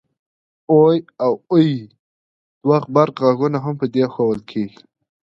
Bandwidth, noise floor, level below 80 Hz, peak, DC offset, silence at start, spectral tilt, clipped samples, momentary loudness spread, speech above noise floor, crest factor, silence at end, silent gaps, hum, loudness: 6.2 kHz; under -90 dBFS; -62 dBFS; 0 dBFS; under 0.1%; 0.7 s; -9 dB/octave; under 0.1%; 11 LU; over 73 dB; 18 dB; 0.55 s; 1.99-2.61 s; none; -18 LUFS